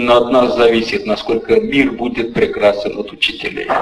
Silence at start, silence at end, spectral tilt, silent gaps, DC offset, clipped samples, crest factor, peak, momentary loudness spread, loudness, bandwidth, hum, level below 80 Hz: 0 s; 0 s; -5.5 dB/octave; none; under 0.1%; under 0.1%; 14 dB; 0 dBFS; 8 LU; -15 LUFS; 12 kHz; none; -42 dBFS